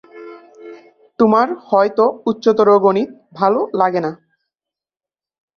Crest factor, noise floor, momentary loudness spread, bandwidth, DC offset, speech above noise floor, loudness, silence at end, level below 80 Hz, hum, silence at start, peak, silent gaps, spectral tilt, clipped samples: 16 dB; under -90 dBFS; 13 LU; 6.6 kHz; under 0.1%; over 75 dB; -15 LUFS; 1.45 s; -64 dBFS; none; 0.15 s; -2 dBFS; none; -7.5 dB/octave; under 0.1%